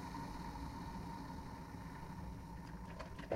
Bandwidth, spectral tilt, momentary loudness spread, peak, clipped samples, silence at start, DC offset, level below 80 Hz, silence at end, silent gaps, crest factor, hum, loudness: 16 kHz; -6.5 dB/octave; 3 LU; -26 dBFS; under 0.1%; 0 s; under 0.1%; -54 dBFS; 0 s; none; 20 dB; none; -49 LUFS